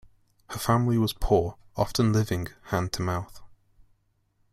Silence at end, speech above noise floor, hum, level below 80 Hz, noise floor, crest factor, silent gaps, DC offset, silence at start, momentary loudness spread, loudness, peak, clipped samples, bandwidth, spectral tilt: 1.05 s; 44 dB; none; -42 dBFS; -69 dBFS; 18 dB; none; under 0.1%; 0.5 s; 10 LU; -27 LUFS; -10 dBFS; under 0.1%; 16 kHz; -6 dB/octave